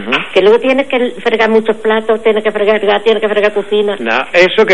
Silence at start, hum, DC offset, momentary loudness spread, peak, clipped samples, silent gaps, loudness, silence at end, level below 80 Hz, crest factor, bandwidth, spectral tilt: 0 s; none; 3%; 5 LU; 0 dBFS; under 0.1%; none; -11 LUFS; 0 s; -50 dBFS; 12 dB; 10.5 kHz; -5 dB/octave